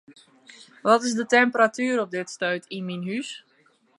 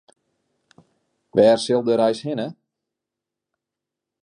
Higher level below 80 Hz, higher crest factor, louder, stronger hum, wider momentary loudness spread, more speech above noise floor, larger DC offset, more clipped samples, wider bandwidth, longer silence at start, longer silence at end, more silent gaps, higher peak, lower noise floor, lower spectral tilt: second, -80 dBFS vs -68 dBFS; about the same, 20 dB vs 20 dB; second, -23 LUFS vs -19 LUFS; neither; about the same, 12 LU vs 12 LU; second, 39 dB vs 67 dB; neither; neither; about the same, 11.5 kHz vs 11 kHz; second, 0.1 s vs 1.35 s; second, 0.6 s vs 1.7 s; neither; about the same, -4 dBFS vs -4 dBFS; second, -62 dBFS vs -85 dBFS; second, -4 dB/octave vs -5.5 dB/octave